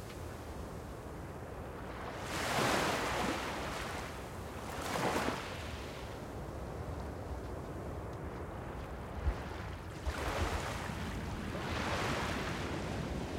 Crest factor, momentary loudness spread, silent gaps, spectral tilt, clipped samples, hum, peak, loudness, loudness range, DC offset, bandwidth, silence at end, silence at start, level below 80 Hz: 20 dB; 11 LU; none; -4.5 dB/octave; under 0.1%; none; -18 dBFS; -39 LUFS; 7 LU; under 0.1%; 16 kHz; 0 s; 0 s; -48 dBFS